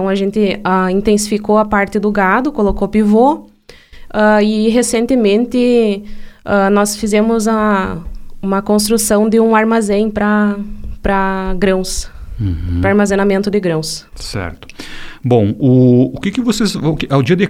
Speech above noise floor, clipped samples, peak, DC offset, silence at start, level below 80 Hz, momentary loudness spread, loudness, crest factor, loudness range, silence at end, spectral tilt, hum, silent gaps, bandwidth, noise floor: 26 dB; under 0.1%; 0 dBFS; under 0.1%; 0 s; -30 dBFS; 13 LU; -14 LUFS; 14 dB; 3 LU; 0 s; -5.5 dB/octave; none; none; 16 kHz; -39 dBFS